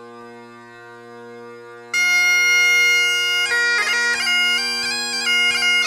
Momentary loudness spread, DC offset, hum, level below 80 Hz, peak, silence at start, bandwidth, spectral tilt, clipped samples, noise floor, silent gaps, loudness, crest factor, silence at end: 7 LU; under 0.1%; none; -68 dBFS; -8 dBFS; 0 s; 17.5 kHz; 1.5 dB/octave; under 0.1%; -40 dBFS; none; -15 LUFS; 12 dB; 0 s